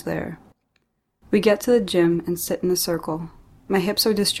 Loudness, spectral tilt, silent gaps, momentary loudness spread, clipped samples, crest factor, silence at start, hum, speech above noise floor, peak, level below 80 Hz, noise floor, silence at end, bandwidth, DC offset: -21 LUFS; -4.5 dB/octave; none; 12 LU; under 0.1%; 18 dB; 0.05 s; none; 49 dB; -6 dBFS; -52 dBFS; -70 dBFS; 0 s; 16.5 kHz; under 0.1%